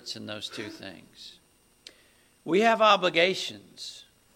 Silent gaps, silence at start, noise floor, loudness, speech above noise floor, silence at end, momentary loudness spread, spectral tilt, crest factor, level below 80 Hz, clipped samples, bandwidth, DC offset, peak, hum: none; 0.05 s; -61 dBFS; -24 LUFS; 35 dB; 0.35 s; 25 LU; -3.5 dB/octave; 20 dB; -72 dBFS; under 0.1%; 16.5 kHz; under 0.1%; -8 dBFS; none